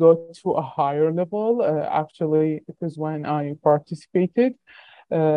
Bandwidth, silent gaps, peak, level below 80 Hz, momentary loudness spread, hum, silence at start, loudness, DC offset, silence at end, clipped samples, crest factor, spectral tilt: 9.4 kHz; none; -4 dBFS; -70 dBFS; 7 LU; none; 0 s; -23 LUFS; under 0.1%; 0 s; under 0.1%; 18 dB; -9 dB/octave